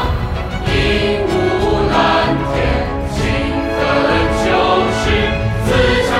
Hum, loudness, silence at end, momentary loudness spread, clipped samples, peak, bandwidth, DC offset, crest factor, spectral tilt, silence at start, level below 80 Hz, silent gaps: none; -15 LUFS; 0 s; 6 LU; under 0.1%; -2 dBFS; 15 kHz; under 0.1%; 12 dB; -5.5 dB/octave; 0 s; -24 dBFS; none